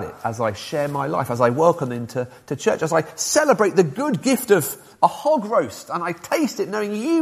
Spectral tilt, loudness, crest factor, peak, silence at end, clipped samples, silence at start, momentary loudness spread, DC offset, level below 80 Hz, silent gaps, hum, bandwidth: -4.5 dB/octave; -21 LUFS; 20 dB; 0 dBFS; 0 s; under 0.1%; 0 s; 10 LU; under 0.1%; -62 dBFS; none; none; 15.5 kHz